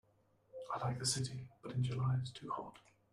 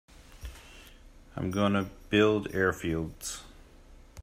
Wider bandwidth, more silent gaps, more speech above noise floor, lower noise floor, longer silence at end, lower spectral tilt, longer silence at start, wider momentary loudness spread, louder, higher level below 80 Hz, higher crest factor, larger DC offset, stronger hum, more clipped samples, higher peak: second, 13 kHz vs 16 kHz; neither; first, 34 dB vs 25 dB; first, -73 dBFS vs -53 dBFS; first, 0.35 s vs 0 s; about the same, -4.5 dB/octave vs -5.5 dB/octave; first, 0.55 s vs 0.15 s; second, 15 LU vs 22 LU; second, -40 LUFS vs -29 LUFS; second, -68 dBFS vs -52 dBFS; about the same, 18 dB vs 22 dB; neither; neither; neither; second, -22 dBFS vs -10 dBFS